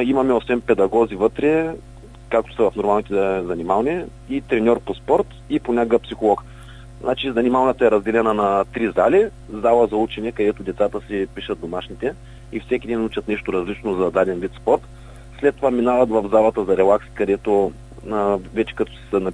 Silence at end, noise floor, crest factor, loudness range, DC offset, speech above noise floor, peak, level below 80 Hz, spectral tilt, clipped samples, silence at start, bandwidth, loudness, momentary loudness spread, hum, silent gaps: 0 s; -39 dBFS; 18 dB; 5 LU; under 0.1%; 20 dB; -2 dBFS; -42 dBFS; -7 dB/octave; under 0.1%; 0 s; 10.5 kHz; -20 LUFS; 10 LU; none; none